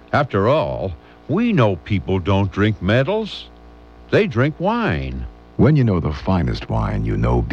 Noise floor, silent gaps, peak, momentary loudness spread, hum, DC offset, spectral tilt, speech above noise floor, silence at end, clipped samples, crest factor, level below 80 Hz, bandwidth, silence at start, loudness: -42 dBFS; none; -2 dBFS; 11 LU; none; 0.1%; -8.5 dB/octave; 25 dB; 0 s; under 0.1%; 16 dB; -32 dBFS; 7.4 kHz; 0.1 s; -19 LUFS